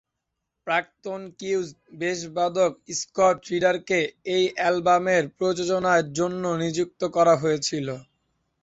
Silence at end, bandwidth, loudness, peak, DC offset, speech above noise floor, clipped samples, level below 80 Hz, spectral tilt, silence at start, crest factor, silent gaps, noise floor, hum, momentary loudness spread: 0.6 s; 8 kHz; -24 LUFS; -6 dBFS; under 0.1%; 58 dB; under 0.1%; -64 dBFS; -4.5 dB/octave; 0.65 s; 18 dB; none; -82 dBFS; none; 12 LU